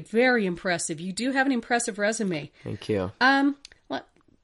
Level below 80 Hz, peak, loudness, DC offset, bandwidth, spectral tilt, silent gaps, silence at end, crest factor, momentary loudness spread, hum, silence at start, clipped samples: -62 dBFS; -8 dBFS; -25 LUFS; under 0.1%; 11.5 kHz; -4 dB/octave; none; 0.4 s; 18 dB; 15 LU; none; 0 s; under 0.1%